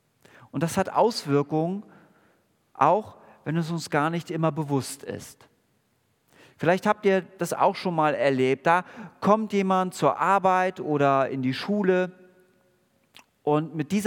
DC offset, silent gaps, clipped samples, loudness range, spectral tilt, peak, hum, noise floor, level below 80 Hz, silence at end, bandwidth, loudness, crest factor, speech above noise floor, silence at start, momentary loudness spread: under 0.1%; none; under 0.1%; 5 LU; -6 dB/octave; -6 dBFS; none; -69 dBFS; -72 dBFS; 0 s; 18 kHz; -24 LUFS; 20 dB; 45 dB; 0.55 s; 11 LU